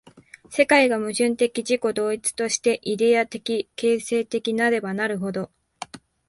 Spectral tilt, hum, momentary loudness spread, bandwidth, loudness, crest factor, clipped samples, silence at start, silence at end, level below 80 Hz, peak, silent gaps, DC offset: -3.5 dB/octave; none; 13 LU; 11.5 kHz; -22 LUFS; 20 dB; under 0.1%; 0.5 s; 0.3 s; -66 dBFS; -4 dBFS; none; under 0.1%